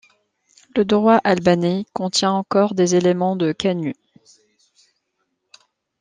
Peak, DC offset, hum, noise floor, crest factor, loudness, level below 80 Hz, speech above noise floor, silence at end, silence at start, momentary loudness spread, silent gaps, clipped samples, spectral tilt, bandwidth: -2 dBFS; under 0.1%; none; -73 dBFS; 18 dB; -18 LUFS; -60 dBFS; 55 dB; 2.1 s; 0.75 s; 10 LU; none; under 0.1%; -5.5 dB/octave; 9.8 kHz